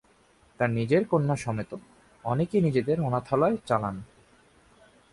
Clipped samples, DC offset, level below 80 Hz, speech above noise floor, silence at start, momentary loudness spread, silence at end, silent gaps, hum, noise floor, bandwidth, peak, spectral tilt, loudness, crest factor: under 0.1%; under 0.1%; -58 dBFS; 35 dB; 0.6 s; 13 LU; 1.1 s; none; none; -61 dBFS; 11.5 kHz; -10 dBFS; -8 dB/octave; -27 LUFS; 18 dB